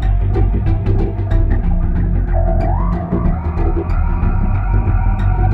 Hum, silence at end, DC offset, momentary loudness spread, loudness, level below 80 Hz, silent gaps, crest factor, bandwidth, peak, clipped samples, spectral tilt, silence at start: none; 0 s; under 0.1%; 2 LU; -17 LUFS; -16 dBFS; none; 10 dB; 4 kHz; -2 dBFS; under 0.1%; -10.5 dB/octave; 0 s